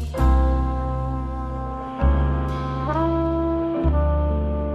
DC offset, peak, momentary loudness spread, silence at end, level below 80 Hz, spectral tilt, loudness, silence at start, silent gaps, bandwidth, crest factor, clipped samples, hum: under 0.1%; -6 dBFS; 8 LU; 0 s; -24 dBFS; -9 dB/octave; -23 LUFS; 0 s; none; 5.2 kHz; 14 dB; under 0.1%; none